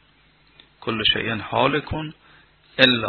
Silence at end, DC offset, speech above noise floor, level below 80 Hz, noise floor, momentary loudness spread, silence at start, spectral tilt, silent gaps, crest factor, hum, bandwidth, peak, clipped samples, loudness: 0 s; under 0.1%; 36 dB; -48 dBFS; -57 dBFS; 16 LU; 0.8 s; -6 dB/octave; none; 24 dB; none; 6 kHz; 0 dBFS; under 0.1%; -21 LUFS